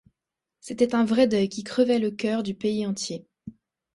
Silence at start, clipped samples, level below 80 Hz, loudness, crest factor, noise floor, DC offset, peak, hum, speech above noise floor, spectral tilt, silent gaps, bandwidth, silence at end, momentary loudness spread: 0.65 s; under 0.1%; -64 dBFS; -24 LUFS; 18 dB; -87 dBFS; under 0.1%; -8 dBFS; none; 63 dB; -5 dB/octave; none; 11.5 kHz; 0.45 s; 13 LU